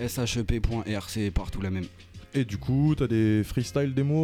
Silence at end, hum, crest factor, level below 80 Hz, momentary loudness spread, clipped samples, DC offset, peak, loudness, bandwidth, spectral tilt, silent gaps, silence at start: 0 s; none; 14 dB; -38 dBFS; 8 LU; under 0.1%; under 0.1%; -12 dBFS; -28 LUFS; 16.5 kHz; -6.5 dB/octave; none; 0 s